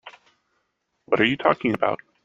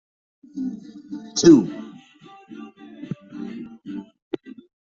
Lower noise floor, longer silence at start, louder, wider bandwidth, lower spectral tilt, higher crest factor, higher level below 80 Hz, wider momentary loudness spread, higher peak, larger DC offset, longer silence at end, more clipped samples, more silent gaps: first, -74 dBFS vs -48 dBFS; second, 0.05 s vs 0.55 s; second, -22 LUFS vs -19 LUFS; about the same, 7.6 kHz vs 7.6 kHz; first, -7 dB/octave vs -5.5 dB/octave; about the same, 22 dB vs 22 dB; about the same, -62 dBFS vs -60 dBFS; second, 6 LU vs 27 LU; about the same, -2 dBFS vs -2 dBFS; neither; about the same, 0.3 s vs 0.4 s; neither; second, none vs 4.22-4.31 s